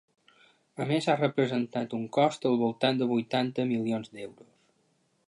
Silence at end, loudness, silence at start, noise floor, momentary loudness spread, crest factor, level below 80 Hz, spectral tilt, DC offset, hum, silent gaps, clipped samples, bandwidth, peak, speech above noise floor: 0.95 s; -28 LUFS; 0.8 s; -71 dBFS; 12 LU; 20 dB; -78 dBFS; -6.5 dB/octave; under 0.1%; none; none; under 0.1%; 11.5 kHz; -10 dBFS; 43 dB